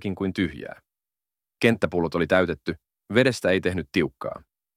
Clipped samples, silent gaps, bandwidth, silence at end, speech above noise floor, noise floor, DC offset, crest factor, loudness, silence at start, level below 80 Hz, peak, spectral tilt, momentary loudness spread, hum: under 0.1%; none; 15.5 kHz; 0.4 s; over 66 dB; under -90 dBFS; under 0.1%; 22 dB; -24 LUFS; 0 s; -52 dBFS; -4 dBFS; -6 dB/octave; 15 LU; none